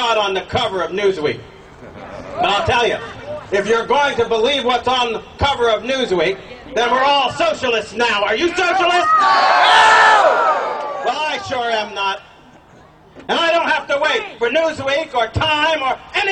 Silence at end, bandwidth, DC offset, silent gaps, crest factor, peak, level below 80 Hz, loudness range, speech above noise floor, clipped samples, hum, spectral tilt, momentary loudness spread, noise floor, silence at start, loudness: 0 s; 10 kHz; under 0.1%; none; 16 dB; 0 dBFS; -44 dBFS; 7 LU; 29 dB; under 0.1%; none; -3.5 dB/octave; 10 LU; -45 dBFS; 0 s; -16 LUFS